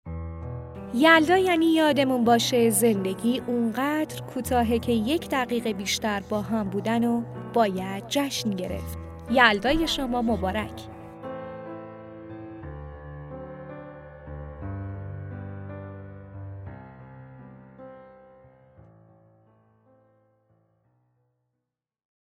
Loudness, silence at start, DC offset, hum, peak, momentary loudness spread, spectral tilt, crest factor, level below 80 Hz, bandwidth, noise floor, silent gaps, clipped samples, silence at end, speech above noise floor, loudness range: -24 LUFS; 0.05 s; under 0.1%; none; -2 dBFS; 22 LU; -4.5 dB/octave; 24 dB; -50 dBFS; 16 kHz; -84 dBFS; none; under 0.1%; 4.1 s; 61 dB; 19 LU